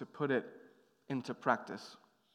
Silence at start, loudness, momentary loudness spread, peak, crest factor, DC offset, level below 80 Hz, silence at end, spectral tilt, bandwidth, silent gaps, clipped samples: 0 s; -38 LUFS; 16 LU; -14 dBFS; 24 dB; under 0.1%; under -90 dBFS; 0.4 s; -6.5 dB/octave; 12 kHz; none; under 0.1%